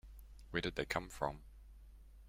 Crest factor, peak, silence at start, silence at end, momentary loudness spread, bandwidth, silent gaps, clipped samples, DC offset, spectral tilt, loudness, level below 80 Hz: 24 dB; -20 dBFS; 0.05 s; 0 s; 22 LU; 16.5 kHz; none; under 0.1%; under 0.1%; -4.5 dB/octave; -41 LUFS; -56 dBFS